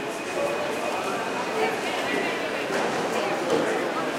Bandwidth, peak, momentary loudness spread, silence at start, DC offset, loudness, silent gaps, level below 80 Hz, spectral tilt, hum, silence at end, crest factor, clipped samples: 16.5 kHz; -12 dBFS; 3 LU; 0 s; under 0.1%; -26 LUFS; none; -68 dBFS; -3.5 dB/octave; none; 0 s; 16 dB; under 0.1%